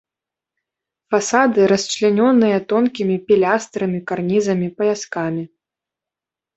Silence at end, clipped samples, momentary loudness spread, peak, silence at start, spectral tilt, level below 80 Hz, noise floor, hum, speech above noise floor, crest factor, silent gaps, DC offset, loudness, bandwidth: 1.1 s; under 0.1%; 9 LU; -2 dBFS; 1.1 s; -5 dB/octave; -62 dBFS; -87 dBFS; none; 71 dB; 16 dB; none; under 0.1%; -17 LUFS; 8.2 kHz